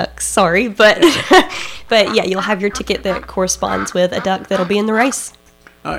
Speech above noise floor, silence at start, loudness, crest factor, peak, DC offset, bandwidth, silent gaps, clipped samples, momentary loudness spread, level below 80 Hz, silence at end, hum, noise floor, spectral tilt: 21 dB; 0 s; -14 LUFS; 14 dB; -2 dBFS; under 0.1%; 16.5 kHz; none; under 0.1%; 10 LU; -42 dBFS; 0 s; none; -36 dBFS; -3.5 dB/octave